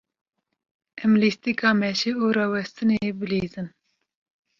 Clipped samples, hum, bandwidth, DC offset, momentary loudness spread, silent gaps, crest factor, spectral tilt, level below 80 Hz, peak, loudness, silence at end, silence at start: under 0.1%; none; 7.2 kHz; under 0.1%; 8 LU; none; 18 dB; -5.5 dB/octave; -60 dBFS; -6 dBFS; -23 LUFS; 0.9 s; 0.95 s